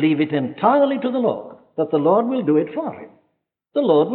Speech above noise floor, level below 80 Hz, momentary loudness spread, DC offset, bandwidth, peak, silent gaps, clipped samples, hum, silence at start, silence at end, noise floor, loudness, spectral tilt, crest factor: 53 dB; -72 dBFS; 13 LU; under 0.1%; 4.3 kHz; -4 dBFS; none; under 0.1%; none; 0 s; 0 s; -71 dBFS; -19 LUFS; -11 dB/octave; 16 dB